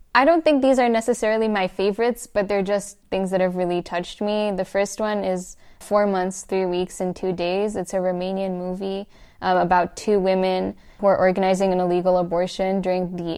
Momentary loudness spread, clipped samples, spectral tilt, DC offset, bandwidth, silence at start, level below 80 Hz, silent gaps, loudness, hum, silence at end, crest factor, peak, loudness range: 9 LU; under 0.1%; -5.5 dB/octave; under 0.1%; 14 kHz; 0.15 s; -50 dBFS; none; -22 LUFS; none; 0 s; 18 dB; -4 dBFS; 4 LU